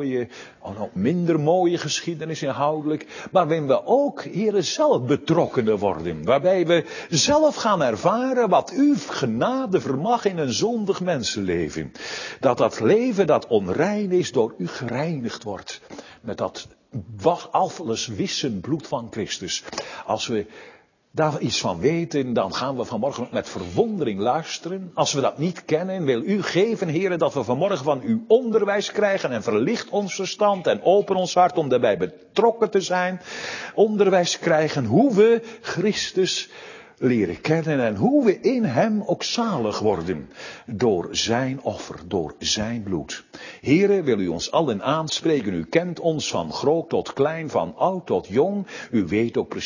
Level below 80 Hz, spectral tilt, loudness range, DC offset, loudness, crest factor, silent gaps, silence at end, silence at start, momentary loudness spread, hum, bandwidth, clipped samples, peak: -54 dBFS; -5 dB/octave; 5 LU; under 0.1%; -22 LUFS; 18 dB; none; 0 s; 0 s; 11 LU; none; 7.4 kHz; under 0.1%; -4 dBFS